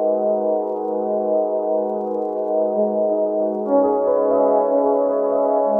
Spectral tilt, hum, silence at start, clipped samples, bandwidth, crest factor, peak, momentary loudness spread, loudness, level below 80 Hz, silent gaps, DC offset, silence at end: -11.5 dB/octave; none; 0 s; under 0.1%; 2.2 kHz; 14 dB; -6 dBFS; 6 LU; -19 LUFS; -64 dBFS; none; under 0.1%; 0 s